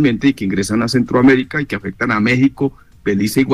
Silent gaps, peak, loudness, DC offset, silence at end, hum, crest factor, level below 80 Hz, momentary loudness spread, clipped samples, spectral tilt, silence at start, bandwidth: none; -4 dBFS; -16 LUFS; 0.3%; 0 s; none; 12 dB; -44 dBFS; 10 LU; under 0.1%; -6 dB/octave; 0 s; 15 kHz